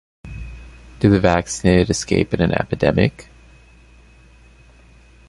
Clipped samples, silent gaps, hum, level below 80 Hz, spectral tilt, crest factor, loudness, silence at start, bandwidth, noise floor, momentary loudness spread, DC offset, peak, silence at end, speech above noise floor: under 0.1%; none; none; -36 dBFS; -6 dB/octave; 20 dB; -17 LUFS; 0.25 s; 11.5 kHz; -47 dBFS; 20 LU; under 0.1%; -2 dBFS; 2.05 s; 31 dB